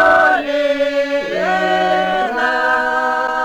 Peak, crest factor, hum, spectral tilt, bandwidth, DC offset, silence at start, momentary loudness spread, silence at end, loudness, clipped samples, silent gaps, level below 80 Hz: -2 dBFS; 12 dB; none; -4 dB/octave; 19.5 kHz; under 0.1%; 0 s; 4 LU; 0 s; -15 LUFS; under 0.1%; none; -50 dBFS